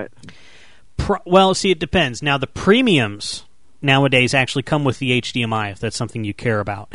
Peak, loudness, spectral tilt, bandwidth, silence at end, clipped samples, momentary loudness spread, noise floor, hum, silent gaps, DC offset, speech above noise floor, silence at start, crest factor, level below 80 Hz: -2 dBFS; -18 LUFS; -5 dB/octave; 11 kHz; 0 s; under 0.1%; 12 LU; -49 dBFS; none; none; 0.8%; 32 dB; 0 s; 18 dB; -42 dBFS